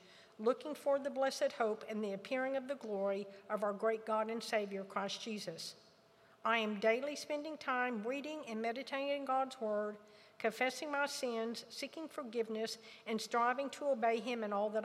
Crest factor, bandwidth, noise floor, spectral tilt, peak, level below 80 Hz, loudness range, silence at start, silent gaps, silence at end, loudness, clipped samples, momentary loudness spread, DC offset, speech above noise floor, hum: 20 dB; 15.5 kHz; -66 dBFS; -3.5 dB/octave; -18 dBFS; under -90 dBFS; 2 LU; 0.05 s; none; 0 s; -38 LUFS; under 0.1%; 9 LU; under 0.1%; 28 dB; none